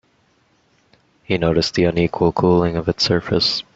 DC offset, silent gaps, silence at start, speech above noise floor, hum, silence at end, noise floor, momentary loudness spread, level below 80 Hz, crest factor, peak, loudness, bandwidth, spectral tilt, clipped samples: under 0.1%; none; 1.3 s; 43 dB; none; 0.15 s; -60 dBFS; 4 LU; -44 dBFS; 18 dB; -2 dBFS; -18 LUFS; 7.8 kHz; -5.5 dB/octave; under 0.1%